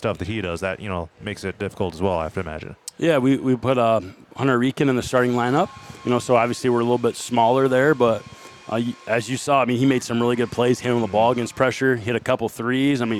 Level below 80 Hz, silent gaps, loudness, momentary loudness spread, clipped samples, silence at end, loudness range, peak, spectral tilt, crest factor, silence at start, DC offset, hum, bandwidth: -54 dBFS; none; -21 LUFS; 11 LU; under 0.1%; 0 s; 3 LU; -2 dBFS; -6 dB/octave; 18 dB; 0 s; under 0.1%; none; 14.5 kHz